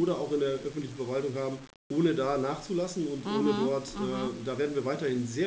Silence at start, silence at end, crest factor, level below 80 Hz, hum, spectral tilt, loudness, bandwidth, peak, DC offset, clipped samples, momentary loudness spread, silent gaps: 0 s; 0 s; 16 dB; -60 dBFS; none; -6 dB/octave; -31 LUFS; 8 kHz; -14 dBFS; under 0.1%; under 0.1%; 7 LU; 1.76-1.90 s